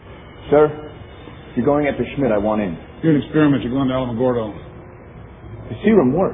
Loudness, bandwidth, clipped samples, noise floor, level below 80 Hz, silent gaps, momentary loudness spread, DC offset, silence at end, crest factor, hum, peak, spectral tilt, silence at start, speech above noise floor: -18 LUFS; 3.8 kHz; under 0.1%; -38 dBFS; -42 dBFS; none; 23 LU; under 0.1%; 0 s; 18 dB; none; 0 dBFS; -12 dB/octave; 0.05 s; 21 dB